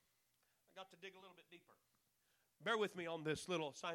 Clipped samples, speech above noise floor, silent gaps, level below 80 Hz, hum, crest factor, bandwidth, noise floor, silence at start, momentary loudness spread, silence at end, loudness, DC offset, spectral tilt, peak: under 0.1%; 36 dB; none; -84 dBFS; none; 20 dB; 17 kHz; -82 dBFS; 0.75 s; 23 LU; 0 s; -44 LUFS; under 0.1%; -4 dB/octave; -28 dBFS